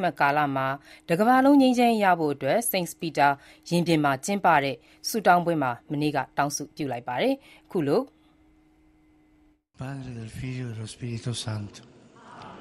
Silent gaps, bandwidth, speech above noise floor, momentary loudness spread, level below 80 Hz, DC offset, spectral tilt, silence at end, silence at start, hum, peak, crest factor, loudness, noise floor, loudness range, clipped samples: none; 15.5 kHz; 37 dB; 16 LU; -62 dBFS; under 0.1%; -5 dB/octave; 0 s; 0 s; none; -6 dBFS; 20 dB; -25 LUFS; -62 dBFS; 13 LU; under 0.1%